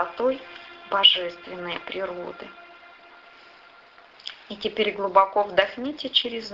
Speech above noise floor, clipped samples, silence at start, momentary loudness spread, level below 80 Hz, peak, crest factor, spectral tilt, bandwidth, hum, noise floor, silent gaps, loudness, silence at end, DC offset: 27 dB; under 0.1%; 0 s; 22 LU; -64 dBFS; -2 dBFS; 26 dB; -4 dB/octave; 7.6 kHz; none; -51 dBFS; none; -23 LUFS; 0 s; under 0.1%